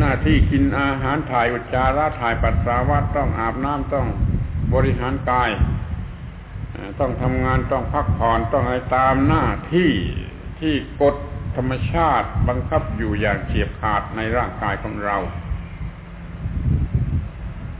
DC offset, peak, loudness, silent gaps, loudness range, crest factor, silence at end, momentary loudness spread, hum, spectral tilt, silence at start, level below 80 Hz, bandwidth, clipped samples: under 0.1%; -4 dBFS; -21 LUFS; none; 5 LU; 16 dB; 0 s; 13 LU; none; -11 dB/octave; 0 s; -28 dBFS; 4 kHz; under 0.1%